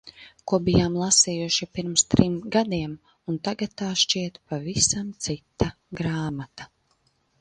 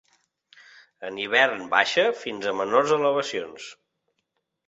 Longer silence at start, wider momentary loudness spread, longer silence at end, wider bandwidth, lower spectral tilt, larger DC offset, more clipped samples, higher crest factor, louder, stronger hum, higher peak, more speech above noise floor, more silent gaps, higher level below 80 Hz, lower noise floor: second, 0.05 s vs 1 s; second, 14 LU vs 18 LU; second, 0.75 s vs 0.95 s; first, 11 kHz vs 8 kHz; about the same, -3.5 dB/octave vs -3 dB/octave; neither; neither; about the same, 24 dB vs 22 dB; about the same, -24 LUFS vs -23 LUFS; neither; first, 0 dBFS vs -4 dBFS; second, 43 dB vs 54 dB; neither; first, -46 dBFS vs -72 dBFS; second, -68 dBFS vs -77 dBFS